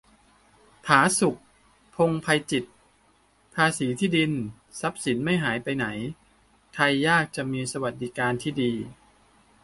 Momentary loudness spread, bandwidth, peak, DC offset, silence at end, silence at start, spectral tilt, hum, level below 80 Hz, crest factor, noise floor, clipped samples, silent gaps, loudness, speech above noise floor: 15 LU; 11.5 kHz; -2 dBFS; under 0.1%; 0.7 s; 0.85 s; -4.5 dB/octave; none; -60 dBFS; 24 dB; -62 dBFS; under 0.1%; none; -25 LUFS; 38 dB